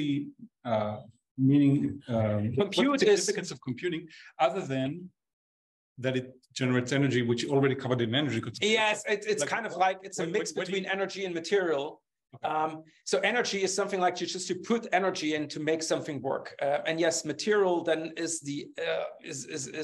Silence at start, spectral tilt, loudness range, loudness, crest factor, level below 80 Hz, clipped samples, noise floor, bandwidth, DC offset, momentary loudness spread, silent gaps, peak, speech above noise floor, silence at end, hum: 0 s; -4.5 dB/octave; 4 LU; -29 LUFS; 18 dB; -72 dBFS; under 0.1%; under -90 dBFS; 12.5 kHz; under 0.1%; 10 LU; 1.31-1.35 s, 5.33-5.96 s; -12 dBFS; over 61 dB; 0 s; none